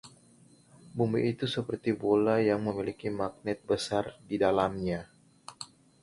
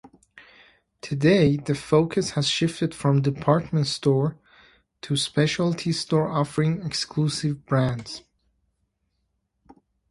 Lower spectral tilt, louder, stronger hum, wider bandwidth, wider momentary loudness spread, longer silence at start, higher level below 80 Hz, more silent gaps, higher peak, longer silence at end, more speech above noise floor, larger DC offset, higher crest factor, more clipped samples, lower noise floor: about the same, -6 dB/octave vs -6 dB/octave; second, -30 LUFS vs -23 LUFS; neither; about the same, 11.5 kHz vs 11.5 kHz; first, 18 LU vs 8 LU; second, 0.05 s vs 0.35 s; about the same, -60 dBFS vs -56 dBFS; neither; second, -12 dBFS vs -4 dBFS; second, 0.35 s vs 1.9 s; second, 30 dB vs 52 dB; neither; about the same, 20 dB vs 20 dB; neither; second, -60 dBFS vs -74 dBFS